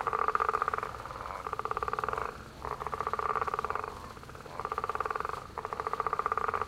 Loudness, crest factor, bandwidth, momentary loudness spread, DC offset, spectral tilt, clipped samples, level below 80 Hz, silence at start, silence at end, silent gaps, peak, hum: -34 LUFS; 24 dB; 16 kHz; 11 LU; under 0.1%; -4.5 dB/octave; under 0.1%; -54 dBFS; 0 s; 0 s; none; -10 dBFS; none